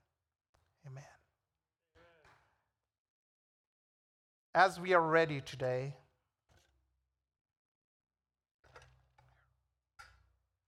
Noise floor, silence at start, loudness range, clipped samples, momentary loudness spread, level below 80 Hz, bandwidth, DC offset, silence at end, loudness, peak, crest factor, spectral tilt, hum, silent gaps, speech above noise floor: under -90 dBFS; 0.85 s; 11 LU; under 0.1%; 25 LU; -76 dBFS; 13.5 kHz; under 0.1%; 4.75 s; -32 LUFS; -12 dBFS; 28 dB; -5.5 dB/octave; none; 2.98-4.53 s; over 58 dB